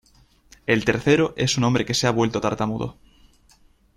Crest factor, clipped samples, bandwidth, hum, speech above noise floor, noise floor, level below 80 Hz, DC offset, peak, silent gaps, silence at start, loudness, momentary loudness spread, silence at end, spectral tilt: 20 dB; under 0.1%; 13.5 kHz; none; 36 dB; -57 dBFS; -50 dBFS; under 0.1%; -2 dBFS; none; 0.7 s; -21 LUFS; 9 LU; 1.05 s; -5 dB/octave